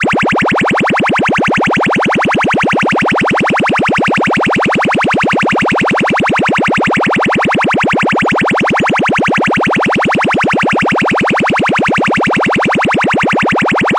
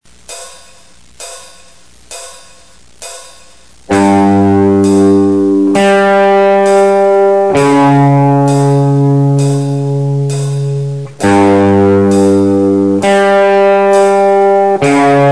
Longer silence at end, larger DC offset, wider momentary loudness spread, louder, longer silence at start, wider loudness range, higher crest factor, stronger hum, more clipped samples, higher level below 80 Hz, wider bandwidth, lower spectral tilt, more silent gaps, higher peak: about the same, 0 s vs 0 s; second, under 0.1% vs 1%; second, 0 LU vs 19 LU; about the same, -11 LUFS vs -9 LUFS; second, 0 s vs 0.3 s; second, 0 LU vs 5 LU; about the same, 8 dB vs 8 dB; neither; neither; first, -42 dBFS vs -48 dBFS; about the same, 11.5 kHz vs 11 kHz; second, -5 dB/octave vs -7 dB/octave; neither; second, -4 dBFS vs 0 dBFS